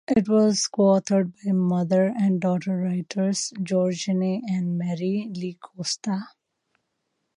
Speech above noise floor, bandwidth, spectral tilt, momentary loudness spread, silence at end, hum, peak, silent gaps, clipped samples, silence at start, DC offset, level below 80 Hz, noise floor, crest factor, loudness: 54 dB; 10.5 kHz; -6 dB/octave; 10 LU; 1.1 s; none; -8 dBFS; none; under 0.1%; 0.1 s; under 0.1%; -64 dBFS; -77 dBFS; 16 dB; -24 LUFS